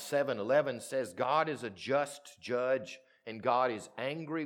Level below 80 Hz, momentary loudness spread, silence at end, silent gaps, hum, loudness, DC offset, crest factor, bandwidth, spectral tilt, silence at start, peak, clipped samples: -84 dBFS; 10 LU; 0 s; none; none; -33 LUFS; under 0.1%; 18 dB; 18 kHz; -4.5 dB/octave; 0 s; -16 dBFS; under 0.1%